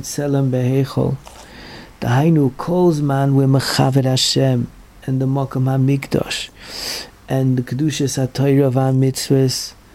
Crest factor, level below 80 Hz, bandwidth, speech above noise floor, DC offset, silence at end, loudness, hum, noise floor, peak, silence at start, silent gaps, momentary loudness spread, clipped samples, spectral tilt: 16 dB; -46 dBFS; 15.5 kHz; 21 dB; under 0.1%; 0.2 s; -17 LUFS; none; -37 dBFS; -2 dBFS; 0 s; none; 12 LU; under 0.1%; -6 dB/octave